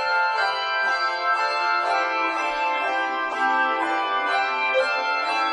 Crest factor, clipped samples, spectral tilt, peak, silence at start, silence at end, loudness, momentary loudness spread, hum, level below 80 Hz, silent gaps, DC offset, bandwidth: 12 dB; under 0.1%; -1 dB/octave; -10 dBFS; 0 s; 0 s; -22 LUFS; 2 LU; none; -66 dBFS; none; under 0.1%; 10.5 kHz